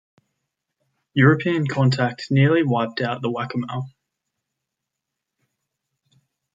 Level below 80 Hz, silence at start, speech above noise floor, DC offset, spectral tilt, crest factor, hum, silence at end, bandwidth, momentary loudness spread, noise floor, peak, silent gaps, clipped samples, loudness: -66 dBFS; 1.15 s; 63 dB; under 0.1%; -7.5 dB/octave; 20 dB; none; 2.65 s; 7.6 kHz; 11 LU; -82 dBFS; -2 dBFS; none; under 0.1%; -20 LUFS